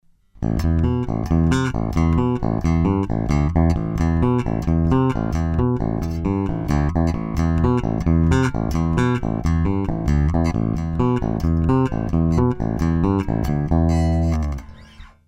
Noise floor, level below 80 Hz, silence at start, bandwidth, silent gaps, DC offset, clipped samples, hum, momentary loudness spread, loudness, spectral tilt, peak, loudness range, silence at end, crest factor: -42 dBFS; -26 dBFS; 0.4 s; 9.8 kHz; none; under 0.1%; under 0.1%; none; 4 LU; -20 LUFS; -8.5 dB/octave; -4 dBFS; 1 LU; 0.2 s; 14 dB